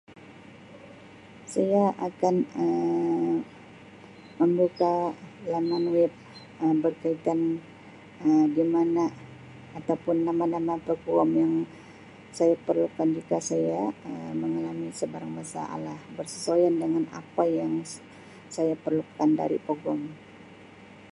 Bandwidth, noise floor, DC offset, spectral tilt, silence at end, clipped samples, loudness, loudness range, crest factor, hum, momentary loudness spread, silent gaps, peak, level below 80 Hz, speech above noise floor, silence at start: 11.5 kHz; -49 dBFS; under 0.1%; -6.5 dB/octave; 0.05 s; under 0.1%; -27 LUFS; 3 LU; 18 dB; none; 20 LU; none; -10 dBFS; -68 dBFS; 23 dB; 0.1 s